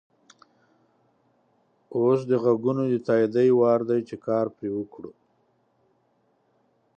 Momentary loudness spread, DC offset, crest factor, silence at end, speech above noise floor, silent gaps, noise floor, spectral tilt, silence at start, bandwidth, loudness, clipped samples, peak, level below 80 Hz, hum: 13 LU; under 0.1%; 18 dB; 1.9 s; 45 dB; none; -68 dBFS; -9 dB/octave; 1.9 s; 7 kHz; -24 LUFS; under 0.1%; -8 dBFS; -72 dBFS; none